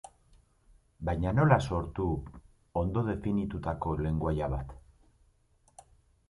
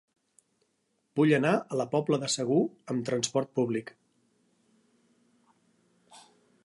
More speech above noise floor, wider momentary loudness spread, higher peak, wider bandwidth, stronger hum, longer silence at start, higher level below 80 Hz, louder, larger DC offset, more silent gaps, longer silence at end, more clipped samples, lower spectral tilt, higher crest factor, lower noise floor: second, 37 dB vs 48 dB; first, 13 LU vs 10 LU; about the same, -10 dBFS vs -12 dBFS; about the same, 11.5 kHz vs 11.5 kHz; neither; second, 0.05 s vs 1.15 s; first, -44 dBFS vs -78 dBFS; second, -31 LUFS vs -28 LUFS; neither; neither; first, 1.5 s vs 0.45 s; neither; first, -8.5 dB/octave vs -5 dB/octave; about the same, 24 dB vs 20 dB; second, -67 dBFS vs -76 dBFS